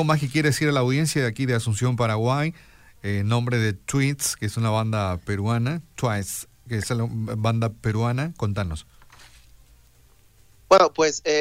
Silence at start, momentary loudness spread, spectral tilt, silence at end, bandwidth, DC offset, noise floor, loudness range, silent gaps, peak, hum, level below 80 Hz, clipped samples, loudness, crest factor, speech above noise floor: 0 s; 9 LU; -5.5 dB/octave; 0 s; 16 kHz; under 0.1%; -55 dBFS; 4 LU; none; -4 dBFS; none; -48 dBFS; under 0.1%; -23 LUFS; 20 dB; 32 dB